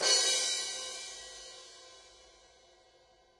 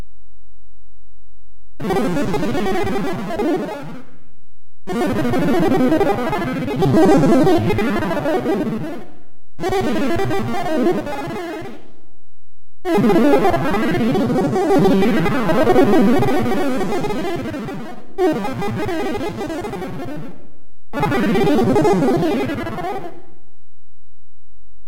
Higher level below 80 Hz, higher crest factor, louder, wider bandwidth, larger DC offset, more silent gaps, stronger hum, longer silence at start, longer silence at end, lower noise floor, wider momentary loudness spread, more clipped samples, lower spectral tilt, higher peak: second, -74 dBFS vs -38 dBFS; first, 22 dB vs 14 dB; second, -30 LUFS vs -18 LUFS; second, 11.5 kHz vs 16.5 kHz; neither; neither; neither; about the same, 0 s vs 0 s; first, 1.3 s vs 0 s; first, -65 dBFS vs -59 dBFS; first, 26 LU vs 15 LU; neither; second, 2.5 dB/octave vs -7 dB/octave; second, -14 dBFS vs -2 dBFS